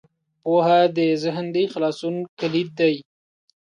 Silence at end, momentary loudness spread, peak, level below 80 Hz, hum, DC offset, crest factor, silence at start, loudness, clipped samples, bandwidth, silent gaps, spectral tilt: 0.6 s; 11 LU; -6 dBFS; -72 dBFS; none; under 0.1%; 16 dB; 0.45 s; -21 LUFS; under 0.1%; 10 kHz; 2.29-2.37 s; -6.5 dB/octave